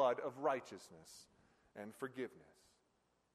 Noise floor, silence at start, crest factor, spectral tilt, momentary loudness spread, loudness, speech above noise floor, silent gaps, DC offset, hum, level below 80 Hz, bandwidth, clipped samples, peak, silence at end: -80 dBFS; 0 s; 22 dB; -4.5 dB/octave; 19 LU; -43 LUFS; 35 dB; none; under 0.1%; none; -86 dBFS; 13 kHz; under 0.1%; -22 dBFS; 0.95 s